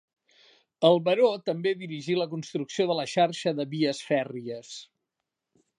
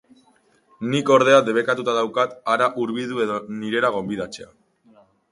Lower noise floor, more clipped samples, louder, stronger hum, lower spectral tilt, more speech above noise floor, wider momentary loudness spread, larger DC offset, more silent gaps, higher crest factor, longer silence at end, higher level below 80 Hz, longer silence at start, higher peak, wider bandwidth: first, -85 dBFS vs -60 dBFS; neither; second, -27 LUFS vs -20 LUFS; neither; about the same, -5.5 dB/octave vs -5 dB/octave; first, 59 dB vs 39 dB; about the same, 15 LU vs 13 LU; neither; neither; about the same, 22 dB vs 22 dB; about the same, 0.95 s vs 0.85 s; second, -82 dBFS vs -64 dBFS; about the same, 0.8 s vs 0.8 s; second, -6 dBFS vs 0 dBFS; about the same, 10.5 kHz vs 11.5 kHz